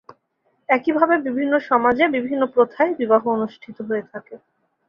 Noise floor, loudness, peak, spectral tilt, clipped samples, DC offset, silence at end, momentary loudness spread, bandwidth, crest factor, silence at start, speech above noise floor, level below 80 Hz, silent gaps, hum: -68 dBFS; -19 LUFS; -2 dBFS; -7.5 dB/octave; under 0.1%; under 0.1%; 0.5 s; 13 LU; 5.8 kHz; 18 dB; 0.7 s; 48 dB; -62 dBFS; none; none